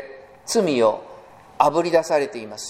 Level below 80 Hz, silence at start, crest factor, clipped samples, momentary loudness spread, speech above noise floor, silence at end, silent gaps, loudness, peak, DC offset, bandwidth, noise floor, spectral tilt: -64 dBFS; 0 s; 22 dB; under 0.1%; 15 LU; 25 dB; 0 s; none; -20 LUFS; 0 dBFS; under 0.1%; 16 kHz; -44 dBFS; -4 dB/octave